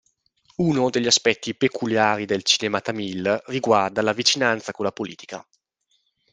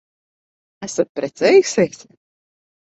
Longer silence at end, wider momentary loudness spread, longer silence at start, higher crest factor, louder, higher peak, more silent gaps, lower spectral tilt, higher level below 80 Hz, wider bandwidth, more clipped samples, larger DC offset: second, 0.9 s vs 1.1 s; about the same, 13 LU vs 12 LU; second, 0.6 s vs 0.8 s; about the same, 20 dB vs 18 dB; second, -21 LUFS vs -17 LUFS; about the same, -2 dBFS vs -2 dBFS; second, none vs 1.09-1.15 s; about the same, -3 dB/octave vs -4 dB/octave; about the same, -64 dBFS vs -64 dBFS; first, 10 kHz vs 8.2 kHz; neither; neither